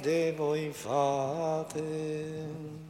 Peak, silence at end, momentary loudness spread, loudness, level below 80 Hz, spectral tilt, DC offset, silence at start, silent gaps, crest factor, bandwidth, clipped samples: -16 dBFS; 0 s; 9 LU; -32 LUFS; -66 dBFS; -6 dB/octave; under 0.1%; 0 s; none; 16 dB; 16.5 kHz; under 0.1%